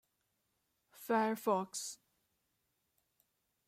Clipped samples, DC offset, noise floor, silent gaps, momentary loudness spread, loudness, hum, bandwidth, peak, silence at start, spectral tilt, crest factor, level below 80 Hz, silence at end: under 0.1%; under 0.1%; -83 dBFS; none; 18 LU; -36 LUFS; none; 16 kHz; -20 dBFS; 0.95 s; -4 dB/octave; 20 dB; -88 dBFS; 1.7 s